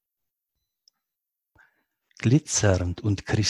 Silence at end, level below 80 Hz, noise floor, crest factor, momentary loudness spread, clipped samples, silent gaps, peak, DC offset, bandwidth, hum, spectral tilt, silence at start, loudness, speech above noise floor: 0 s; -42 dBFS; -85 dBFS; 20 dB; 7 LU; under 0.1%; none; -6 dBFS; under 0.1%; 12 kHz; none; -5 dB/octave; 2.2 s; -24 LUFS; 62 dB